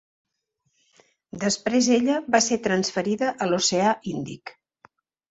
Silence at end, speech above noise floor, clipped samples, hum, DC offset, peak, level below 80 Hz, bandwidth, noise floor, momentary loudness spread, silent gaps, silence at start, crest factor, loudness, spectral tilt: 0.8 s; 52 dB; under 0.1%; none; under 0.1%; -6 dBFS; -64 dBFS; 8 kHz; -75 dBFS; 15 LU; none; 1.35 s; 20 dB; -23 LUFS; -3.5 dB/octave